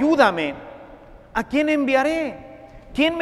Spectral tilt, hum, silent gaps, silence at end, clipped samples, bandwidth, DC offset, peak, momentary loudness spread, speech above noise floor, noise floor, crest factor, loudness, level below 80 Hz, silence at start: -5 dB/octave; none; none; 0 s; under 0.1%; 13.5 kHz; under 0.1%; -2 dBFS; 22 LU; 24 dB; -44 dBFS; 20 dB; -21 LUFS; -48 dBFS; 0 s